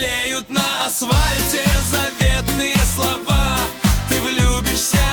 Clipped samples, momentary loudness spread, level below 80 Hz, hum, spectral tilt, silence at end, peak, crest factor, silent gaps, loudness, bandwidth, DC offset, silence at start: under 0.1%; 3 LU; -22 dBFS; none; -3.5 dB/octave; 0 s; -4 dBFS; 14 dB; none; -17 LUFS; over 20 kHz; under 0.1%; 0 s